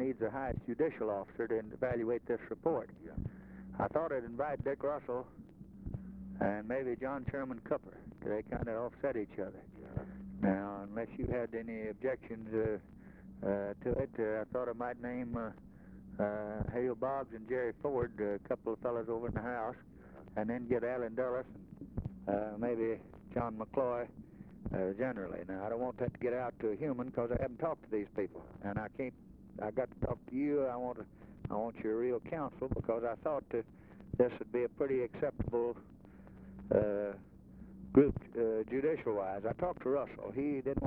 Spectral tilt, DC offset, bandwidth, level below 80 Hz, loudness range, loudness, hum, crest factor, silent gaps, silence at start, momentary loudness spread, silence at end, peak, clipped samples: -10.5 dB/octave; under 0.1%; 4.4 kHz; -56 dBFS; 5 LU; -38 LUFS; none; 24 dB; none; 0 s; 13 LU; 0 s; -14 dBFS; under 0.1%